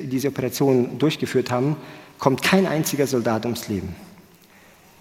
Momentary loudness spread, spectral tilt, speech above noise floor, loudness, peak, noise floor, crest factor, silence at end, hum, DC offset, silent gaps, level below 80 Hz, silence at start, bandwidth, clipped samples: 11 LU; -5.5 dB/octave; 30 dB; -22 LUFS; -2 dBFS; -51 dBFS; 22 dB; 0.8 s; none; under 0.1%; none; -56 dBFS; 0 s; 17 kHz; under 0.1%